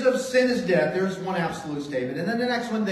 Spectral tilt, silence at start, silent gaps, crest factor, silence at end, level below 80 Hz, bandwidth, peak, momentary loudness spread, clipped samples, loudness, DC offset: -5.5 dB/octave; 0 s; none; 16 dB; 0 s; -60 dBFS; 13 kHz; -8 dBFS; 7 LU; under 0.1%; -25 LUFS; under 0.1%